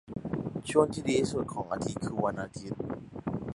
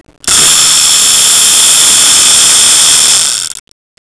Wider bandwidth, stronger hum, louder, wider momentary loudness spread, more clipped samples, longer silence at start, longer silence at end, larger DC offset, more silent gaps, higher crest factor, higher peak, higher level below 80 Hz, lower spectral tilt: about the same, 11.5 kHz vs 11 kHz; neither; second, -32 LUFS vs -3 LUFS; first, 11 LU vs 5 LU; second, under 0.1% vs 3%; second, 0.05 s vs 0.25 s; second, 0 s vs 0.45 s; second, under 0.1% vs 0.5%; neither; first, 24 dB vs 6 dB; second, -8 dBFS vs 0 dBFS; second, -56 dBFS vs -42 dBFS; first, -6 dB/octave vs 2 dB/octave